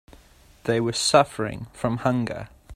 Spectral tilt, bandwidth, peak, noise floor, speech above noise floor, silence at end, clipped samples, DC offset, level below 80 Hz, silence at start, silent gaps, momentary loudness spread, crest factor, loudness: -4.5 dB/octave; 14 kHz; -4 dBFS; -53 dBFS; 30 dB; 0 s; under 0.1%; under 0.1%; -52 dBFS; 0.65 s; none; 13 LU; 22 dB; -24 LUFS